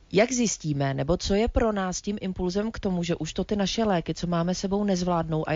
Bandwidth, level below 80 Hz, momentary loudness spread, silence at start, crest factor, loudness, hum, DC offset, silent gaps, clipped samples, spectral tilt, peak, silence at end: 7.6 kHz; -40 dBFS; 6 LU; 0.1 s; 16 dB; -26 LUFS; none; under 0.1%; none; under 0.1%; -5 dB/octave; -8 dBFS; 0 s